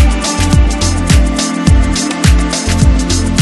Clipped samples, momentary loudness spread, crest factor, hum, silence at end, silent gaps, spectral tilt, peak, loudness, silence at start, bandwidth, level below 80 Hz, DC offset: 0.3%; 3 LU; 10 dB; none; 0 s; none; -4.5 dB/octave; 0 dBFS; -12 LUFS; 0 s; 12.5 kHz; -12 dBFS; under 0.1%